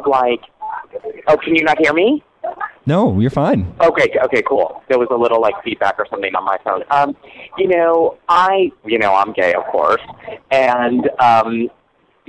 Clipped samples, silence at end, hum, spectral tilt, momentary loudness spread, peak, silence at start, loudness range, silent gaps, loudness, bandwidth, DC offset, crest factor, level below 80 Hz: under 0.1%; 0.6 s; none; -6.5 dB/octave; 13 LU; -2 dBFS; 0 s; 2 LU; none; -15 LUFS; 10 kHz; under 0.1%; 14 dB; -50 dBFS